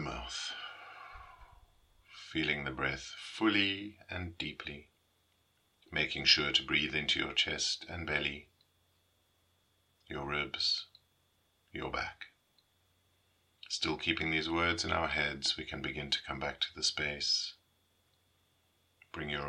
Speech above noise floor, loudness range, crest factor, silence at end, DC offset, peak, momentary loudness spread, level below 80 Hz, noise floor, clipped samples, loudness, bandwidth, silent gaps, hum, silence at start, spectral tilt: 39 dB; 8 LU; 28 dB; 0 s; under 0.1%; -10 dBFS; 17 LU; -60 dBFS; -74 dBFS; under 0.1%; -33 LUFS; 12 kHz; none; none; 0 s; -2.5 dB/octave